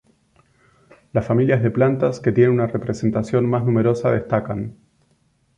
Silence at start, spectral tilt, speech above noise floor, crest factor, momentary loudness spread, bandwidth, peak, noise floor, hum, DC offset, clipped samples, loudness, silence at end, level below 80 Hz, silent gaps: 1.15 s; -9 dB/octave; 44 dB; 16 dB; 8 LU; 9 kHz; -4 dBFS; -62 dBFS; none; under 0.1%; under 0.1%; -19 LUFS; 0.85 s; -50 dBFS; none